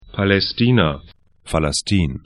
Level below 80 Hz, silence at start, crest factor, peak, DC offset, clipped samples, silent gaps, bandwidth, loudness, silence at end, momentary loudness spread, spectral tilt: -36 dBFS; 0.15 s; 18 dB; 0 dBFS; under 0.1%; under 0.1%; none; 11.5 kHz; -18 LUFS; 0.05 s; 7 LU; -5 dB/octave